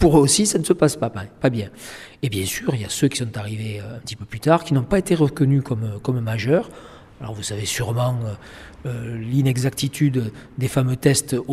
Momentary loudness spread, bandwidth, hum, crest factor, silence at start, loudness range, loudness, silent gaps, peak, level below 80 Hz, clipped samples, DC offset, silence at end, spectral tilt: 14 LU; 15 kHz; none; 18 dB; 0 s; 4 LU; -21 LUFS; none; -2 dBFS; -44 dBFS; under 0.1%; under 0.1%; 0 s; -5.5 dB/octave